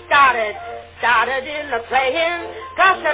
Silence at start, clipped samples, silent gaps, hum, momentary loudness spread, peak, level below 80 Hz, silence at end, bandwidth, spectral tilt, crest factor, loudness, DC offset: 0 s; under 0.1%; none; none; 13 LU; -2 dBFS; -50 dBFS; 0 s; 4 kHz; -6 dB/octave; 16 dB; -17 LUFS; under 0.1%